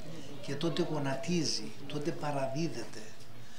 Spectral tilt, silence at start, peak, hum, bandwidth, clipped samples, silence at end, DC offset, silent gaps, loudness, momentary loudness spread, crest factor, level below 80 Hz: -5 dB/octave; 0 s; -18 dBFS; none; 16 kHz; under 0.1%; 0 s; 2%; none; -35 LUFS; 14 LU; 18 dB; -70 dBFS